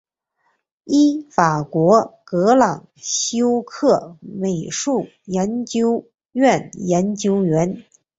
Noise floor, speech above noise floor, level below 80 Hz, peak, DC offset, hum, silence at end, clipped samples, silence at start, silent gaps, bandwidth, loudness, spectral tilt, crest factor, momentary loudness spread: -68 dBFS; 50 dB; -58 dBFS; -2 dBFS; under 0.1%; none; 0.4 s; under 0.1%; 0.85 s; none; 8.2 kHz; -19 LUFS; -5 dB/octave; 18 dB; 9 LU